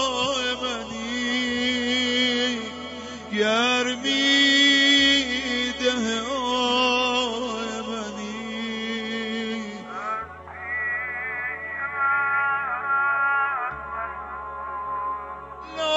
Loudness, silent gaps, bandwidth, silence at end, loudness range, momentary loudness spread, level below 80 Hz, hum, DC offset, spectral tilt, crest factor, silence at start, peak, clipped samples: -23 LUFS; none; 8 kHz; 0 s; 10 LU; 15 LU; -54 dBFS; none; under 0.1%; -2 dB/octave; 16 dB; 0 s; -8 dBFS; under 0.1%